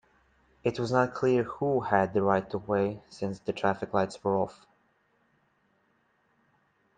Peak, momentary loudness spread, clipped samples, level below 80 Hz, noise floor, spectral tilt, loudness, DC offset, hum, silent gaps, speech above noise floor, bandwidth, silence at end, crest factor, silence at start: -8 dBFS; 8 LU; under 0.1%; -66 dBFS; -70 dBFS; -7 dB/octave; -29 LUFS; under 0.1%; none; none; 42 dB; 9.2 kHz; 2.45 s; 22 dB; 0.65 s